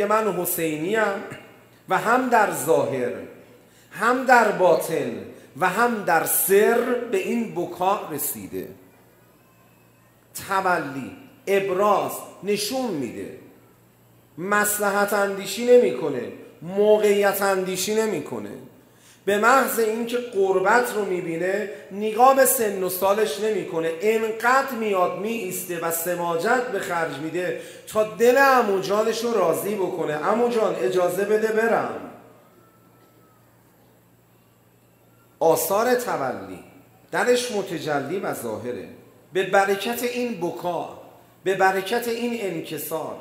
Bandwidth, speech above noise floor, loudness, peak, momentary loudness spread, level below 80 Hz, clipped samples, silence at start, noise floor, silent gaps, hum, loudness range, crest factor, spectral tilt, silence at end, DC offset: 16 kHz; 35 dB; -22 LUFS; -2 dBFS; 15 LU; -70 dBFS; under 0.1%; 0 s; -57 dBFS; none; none; 6 LU; 20 dB; -3.5 dB/octave; 0 s; under 0.1%